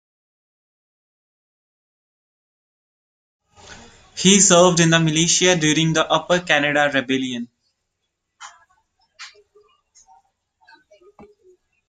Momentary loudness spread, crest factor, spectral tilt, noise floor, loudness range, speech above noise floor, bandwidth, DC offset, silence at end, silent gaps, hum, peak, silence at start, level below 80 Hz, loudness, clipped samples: 13 LU; 22 dB; -3 dB/octave; -76 dBFS; 12 LU; 60 dB; 9.6 kHz; under 0.1%; 2.6 s; none; none; 0 dBFS; 3.7 s; -58 dBFS; -16 LUFS; under 0.1%